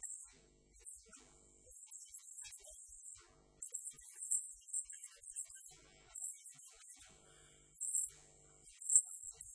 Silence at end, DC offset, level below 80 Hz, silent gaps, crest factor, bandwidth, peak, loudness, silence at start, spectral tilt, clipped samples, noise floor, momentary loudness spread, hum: 0 s; under 0.1%; -76 dBFS; none; 32 dB; 11 kHz; -14 dBFS; -40 LUFS; 0 s; 1 dB/octave; under 0.1%; -67 dBFS; 22 LU; none